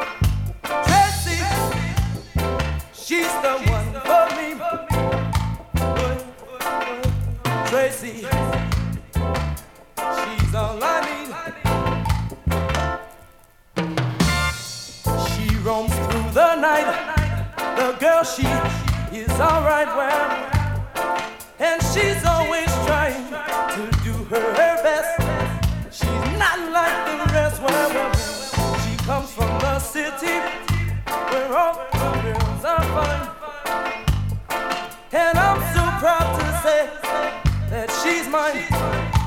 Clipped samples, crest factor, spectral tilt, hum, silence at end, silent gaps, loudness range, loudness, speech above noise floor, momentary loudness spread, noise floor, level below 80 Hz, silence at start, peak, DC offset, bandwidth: under 0.1%; 18 dB; -5 dB/octave; none; 0 s; none; 4 LU; -21 LUFS; 30 dB; 8 LU; -50 dBFS; -30 dBFS; 0 s; -2 dBFS; under 0.1%; 19 kHz